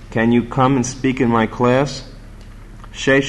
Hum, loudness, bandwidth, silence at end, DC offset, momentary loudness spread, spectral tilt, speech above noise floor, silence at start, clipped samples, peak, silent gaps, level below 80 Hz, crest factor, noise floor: none; -17 LUFS; 10.5 kHz; 0 s; under 0.1%; 8 LU; -5.5 dB/octave; 20 dB; 0 s; under 0.1%; -4 dBFS; none; -38 dBFS; 14 dB; -36 dBFS